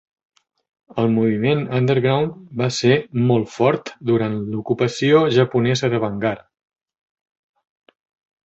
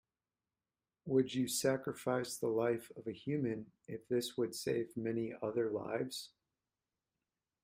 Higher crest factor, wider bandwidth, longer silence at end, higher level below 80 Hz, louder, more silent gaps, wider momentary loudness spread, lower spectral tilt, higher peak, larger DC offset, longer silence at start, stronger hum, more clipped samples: about the same, 18 dB vs 18 dB; second, 8 kHz vs 16 kHz; first, 2.1 s vs 1.35 s; first, -56 dBFS vs -76 dBFS; first, -19 LUFS vs -38 LUFS; neither; second, 8 LU vs 12 LU; first, -6.5 dB/octave vs -5 dB/octave; first, -2 dBFS vs -20 dBFS; neither; second, 0.9 s vs 1.05 s; neither; neither